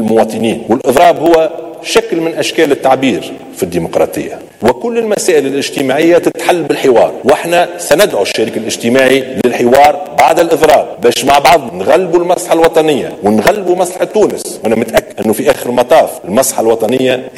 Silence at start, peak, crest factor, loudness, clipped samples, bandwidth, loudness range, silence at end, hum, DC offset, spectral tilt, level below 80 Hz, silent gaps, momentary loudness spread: 0 s; 0 dBFS; 10 dB; -10 LUFS; 0.3%; 17.5 kHz; 4 LU; 0 s; none; under 0.1%; -4 dB/octave; -44 dBFS; none; 7 LU